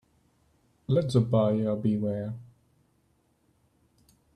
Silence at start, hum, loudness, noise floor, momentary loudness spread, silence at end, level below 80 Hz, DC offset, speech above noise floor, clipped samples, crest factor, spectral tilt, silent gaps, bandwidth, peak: 0.9 s; none; -27 LUFS; -69 dBFS; 15 LU; 1.9 s; -62 dBFS; under 0.1%; 43 dB; under 0.1%; 18 dB; -9 dB/octave; none; 11 kHz; -12 dBFS